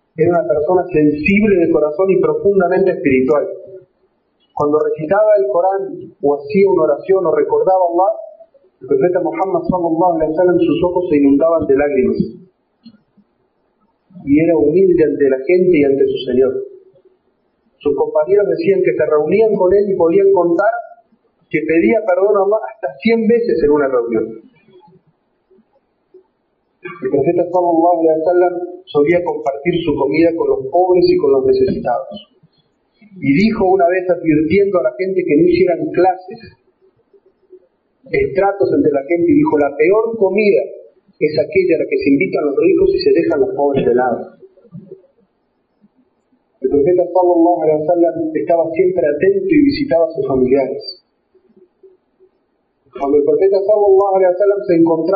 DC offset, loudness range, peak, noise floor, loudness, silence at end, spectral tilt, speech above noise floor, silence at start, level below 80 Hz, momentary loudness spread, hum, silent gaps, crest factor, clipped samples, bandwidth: under 0.1%; 5 LU; -2 dBFS; -64 dBFS; -14 LUFS; 0 s; -6 dB/octave; 51 dB; 0.2 s; -48 dBFS; 8 LU; none; none; 12 dB; under 0.1%; 5 kHz